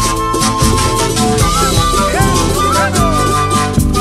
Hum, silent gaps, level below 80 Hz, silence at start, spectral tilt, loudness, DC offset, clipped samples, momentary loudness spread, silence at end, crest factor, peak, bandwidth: none; none; -20 dBFS; 0 s; -4 dB/octave; -12 LUFS; under 0.1%; under 0.1%; 2 LU; 0 s; 12 dB; 0 dBFS; 16 kHz